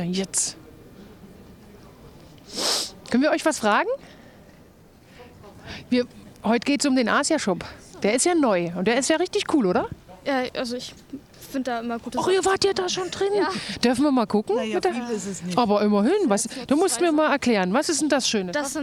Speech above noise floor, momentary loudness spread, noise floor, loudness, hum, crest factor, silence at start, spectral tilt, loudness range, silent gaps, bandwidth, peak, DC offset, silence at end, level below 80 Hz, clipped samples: 28 dB; 11 LU; -51 dBFS; -23 LUFS; none; 16 dB; 0 s; -3.5 dB/octave; 5 LU; none; 17.5 kHz; -8 dBFS; under 0.1%; 0 s; -56 dBFS; under 0.1%